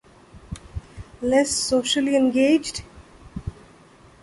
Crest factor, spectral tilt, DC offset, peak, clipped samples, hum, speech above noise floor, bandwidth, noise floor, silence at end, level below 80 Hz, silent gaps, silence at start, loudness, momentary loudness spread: 18 dB; -3.5 dB/octave; under 0.1%; -6 dBFS; under 0.1%; none; 30 dB; 11.5 kHz; -50 dBFS; 0.7 s; -44 dBFS; none; 0.35 s; -20 LUFS; 21 LU